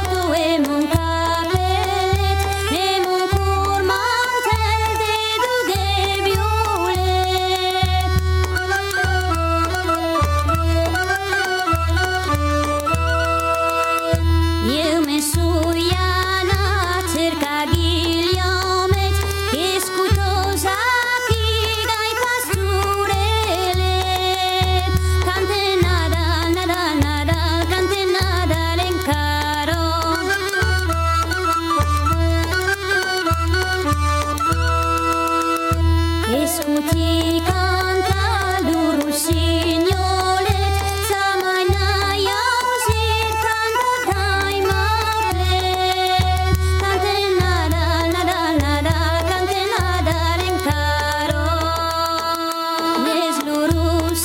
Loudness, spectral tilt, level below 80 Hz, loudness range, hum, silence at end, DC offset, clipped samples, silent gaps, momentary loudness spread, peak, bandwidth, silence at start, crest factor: -18 LUFS; -4.5 dB/octave; -28 dBFS; 1 LU; none; 0 s; under 0.1%; under 0.1%; none; 2 LU; -2 dBFS; 17 kHz; 0 s; 16 dB